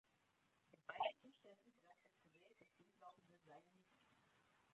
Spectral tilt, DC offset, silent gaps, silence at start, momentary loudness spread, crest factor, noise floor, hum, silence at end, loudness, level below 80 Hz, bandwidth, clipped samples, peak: -0.5 dB/octave; under 0.1%; none; 0.9 s; 21 LU; 28 dB; -82 dBFS; none; 1.1 s; -50 LUFS; under -90 dBFS; 8 kHz; under 0.1%; -32 dBFS